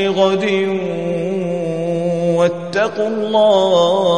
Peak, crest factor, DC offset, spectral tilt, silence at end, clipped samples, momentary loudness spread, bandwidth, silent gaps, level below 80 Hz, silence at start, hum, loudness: -2 dBFS; 14 dB; 0.5%; -6 dB/octave; 0 s; under 0.1%; 8 LU; 9.6 kHz; none; -62 dBFS; 0 s; none; -16 LUFS